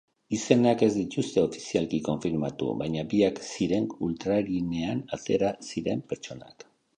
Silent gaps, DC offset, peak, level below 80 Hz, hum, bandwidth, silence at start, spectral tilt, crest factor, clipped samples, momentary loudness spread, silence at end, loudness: none; under 0.1%; -4 dBFS; -58 dBFS; none; 9.8 kHz; 0.3 s; -6 dB/octave; 24 dB; under 0.1%; 10 LU; 0.45 s; -28 LUFS